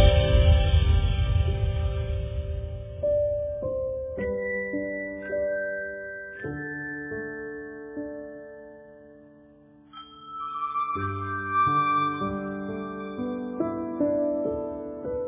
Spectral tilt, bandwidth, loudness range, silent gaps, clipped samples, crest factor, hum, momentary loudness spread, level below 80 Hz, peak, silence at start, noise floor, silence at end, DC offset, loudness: -10.5 dB/octave; 3.8 kHz; 11 LU; none; under 0.1%; 20 dB; none; 15 LU; -30 dBFS; -6 dBFS; 0 s; -54 dBFS; 0 s; under 0.1%; -28 LUFS